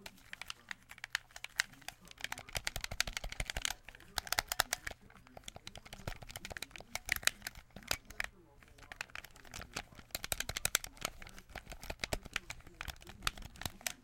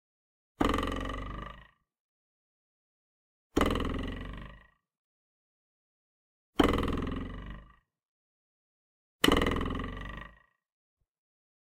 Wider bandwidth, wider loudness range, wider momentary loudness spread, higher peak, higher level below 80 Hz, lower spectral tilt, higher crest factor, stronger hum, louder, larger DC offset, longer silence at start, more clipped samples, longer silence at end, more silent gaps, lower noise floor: about the same, 17 kHz vs 16.5 kHz; about the same, 3 LU vs 4 LU; second, 16 LU vs 20 LU; about the same, -6 dBFS vs -8 dBFS; second, -54 dBFS vs -44 dBFS; second, -1 dB/octave vs -5 dB/octave; first, 38 dB vs 28 dB; neither; second, -41 LUFS vs -32 LUFS; neither; second, 0 s vs 0.6 s; neither; second, 0 s vs 1.45 s; second, none vs 2.00-3.50 s, 4.99-6.53 s, 8.08-9.19 s; first, -61 dBFS vs -57 dBFS